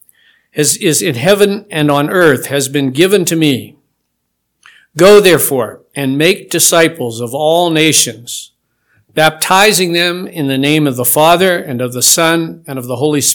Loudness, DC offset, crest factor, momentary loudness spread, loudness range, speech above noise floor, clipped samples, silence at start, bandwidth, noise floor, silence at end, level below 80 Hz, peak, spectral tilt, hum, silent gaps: -11 LUFS; under 0.1%; 12 dB; 12 LU; 2 LU; 57 dB; 1%; 0.55 s; over 20 kHz; -68 dBFS; 0 s; -52 dBFS; 0 dBFS; -3.5 dB/octave; none; none